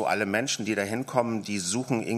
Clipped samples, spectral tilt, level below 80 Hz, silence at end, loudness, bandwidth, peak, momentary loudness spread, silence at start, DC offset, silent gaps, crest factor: under 0.1%; -4 dB/octave; -70 dBFS; 0 s; -28 LUFS; 15.5 kHz; -8 dBFS; 3 LU; 0 s; under 0.1%; none; 20 dB